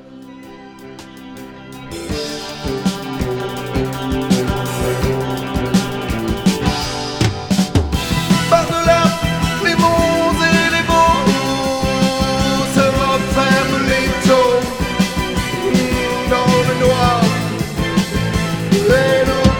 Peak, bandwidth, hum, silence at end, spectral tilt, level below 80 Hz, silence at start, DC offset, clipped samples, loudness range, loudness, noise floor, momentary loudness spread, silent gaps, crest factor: 0 dBFS; 19.5 kHz; none; 0 s; -5 dB/octave; -30 dBFS; 0.05 s; under 0.1%; under 0.1%; 7 LU; -16 LUFS; -36 dBFS; 12 LU; none; 16 dB